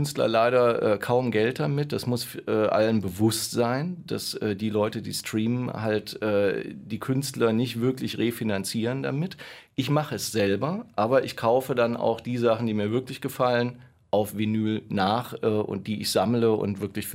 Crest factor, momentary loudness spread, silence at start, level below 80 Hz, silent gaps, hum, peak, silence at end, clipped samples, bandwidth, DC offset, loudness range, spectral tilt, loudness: 16 dB; 7 LU; 0 s; -64 dBFS; none; none; -10 dBFS; 0 s; under 0.1%; 16 kHz; under 0.1%; 3 LU; -5.5 dB/octave; -26 LUFS